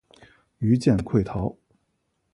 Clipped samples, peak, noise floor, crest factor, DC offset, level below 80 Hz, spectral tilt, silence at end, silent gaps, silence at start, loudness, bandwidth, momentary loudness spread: under 0.1%; -8 dBFS; -73 dBFS; 18 dB; under 0.1%; -46 dBFS; -8.5 dB/octave; 0.8 s; none; 0.6 s; -24 LUFS; 11.5 kHz; 10 LU